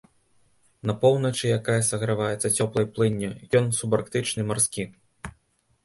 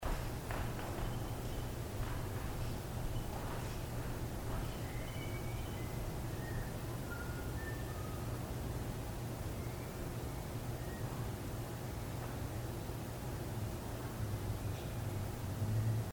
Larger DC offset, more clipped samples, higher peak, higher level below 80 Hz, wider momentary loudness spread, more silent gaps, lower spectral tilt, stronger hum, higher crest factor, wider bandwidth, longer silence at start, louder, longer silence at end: neither; neither; first, -8 dBFS vs -26 dBFS; second, -56 dBFS vs -46 dBFS; first, 13 LU vs 2 LU; neither; second, -4.5 dB/octave vs -6 dB/octave; neither; about the same, 18 dB vs 14 dB; second, 12 kHz vs over 20 kHz; first, 0.85 s vs 0 s; first, -24 LUFS vs -42 LUFS; first, 0.55 s vs 0 s